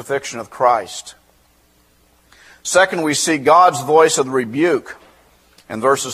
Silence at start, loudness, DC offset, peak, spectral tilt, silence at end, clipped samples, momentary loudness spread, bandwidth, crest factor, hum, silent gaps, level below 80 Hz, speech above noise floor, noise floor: 0 s; -15 LUFS; under 0.1%; 0 dBFS; -3 dB/octave; 0 s; under 0.1%; 17 LU; 15.5 kHz; 18 dB; none; none; -60 dBFS; 40 dB; -55 dBFS